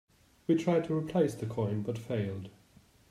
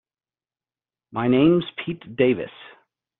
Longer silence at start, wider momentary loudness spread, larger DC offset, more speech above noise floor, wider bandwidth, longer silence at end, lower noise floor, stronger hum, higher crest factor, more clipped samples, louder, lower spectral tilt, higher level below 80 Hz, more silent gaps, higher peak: second, 0.5 s vs 1.15 s; about the same, 13 LU vs 15 LU; neither; second, 31 dB vs over 69 dB; first, 14.5 kHz vs 4.1 kHz; about the same, 0.6 s vs 0.55 s; second, -62 dBFS vs under -90 dBFS; neither; about the same, 18 dB vs 18 dB; neither; second, -32 LUFS vs -21 LUFS; first, -8 dB/octave vs -6 dB/octave; second, -66 dBFS vs -58 dBFS; neither; second, -16 dBFS vs -6 dBFS